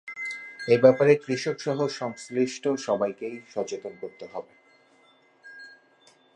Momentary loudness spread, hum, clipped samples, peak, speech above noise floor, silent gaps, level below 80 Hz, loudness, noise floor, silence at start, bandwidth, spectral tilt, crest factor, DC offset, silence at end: 21 LU; none; under 0.1%; -4 dBFS; 35 dB; none; -76 dBFS; -25 LUFS; -60 dBFS; 0.05 s; 9.8 kHz; -5.5 dB/octave; 22 dB; under 0.1%; 0.65 s